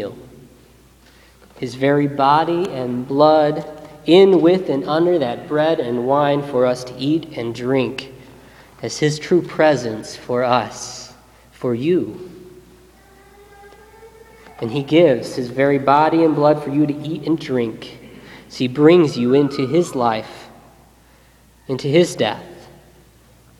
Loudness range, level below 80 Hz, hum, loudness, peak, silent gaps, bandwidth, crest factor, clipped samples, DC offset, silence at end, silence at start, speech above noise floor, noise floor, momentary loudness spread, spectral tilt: 8 LU; -54 dBFS; none; -17 LUFS; 0 dBFS; none; 13 kHz; 18 dB; under 0.1%; under 0.1%; 1 s; 0 s; 34 dB; -50 dBFS; 17 LU; -6 dB/octave